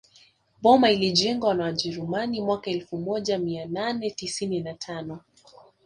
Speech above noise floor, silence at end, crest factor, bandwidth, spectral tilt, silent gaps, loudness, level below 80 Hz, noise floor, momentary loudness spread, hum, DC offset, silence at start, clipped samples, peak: 34 dB; 0.65 s; 22 dB; 11 kHz; -4.5 dB/octave; none; -25 LUFS; -62 dBFS; -59 dBFS; 15 LU; none; under 0.1%; 0.6 s; under 0.1%; -4 dBFS